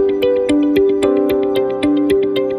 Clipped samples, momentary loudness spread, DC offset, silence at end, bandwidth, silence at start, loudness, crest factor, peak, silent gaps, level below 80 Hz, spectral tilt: under 0.1%; 2 LU; under 0.1%; 0 s; 15 kHz; 0 s; -15 LUFS; 12 dB; -2 dBFS; none; -44 dBFS; -6 dB/octave